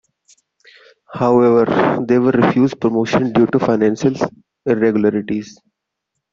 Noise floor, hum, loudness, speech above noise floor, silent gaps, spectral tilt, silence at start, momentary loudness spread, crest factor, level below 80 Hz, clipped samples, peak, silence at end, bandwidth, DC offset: -77 dBFS; none; -16 LUFS; 62 dB; none; -7.5 dB/octave; 1.1 s; 11 LU; 14 dB; -54 dBFS; under 0.1%; -2 dBFS; 0.8 s; 7.4 kHz; under 0.1%